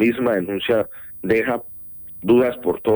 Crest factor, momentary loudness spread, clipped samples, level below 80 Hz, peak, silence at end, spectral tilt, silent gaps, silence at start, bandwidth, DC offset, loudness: 16 dB; 15 LU; under 0.1%; -52 dBFS; -4 dBFS; 0 s; -8 dB/octave; none; 0 s; over 20 kHz; under 0.1%; -20 LUFS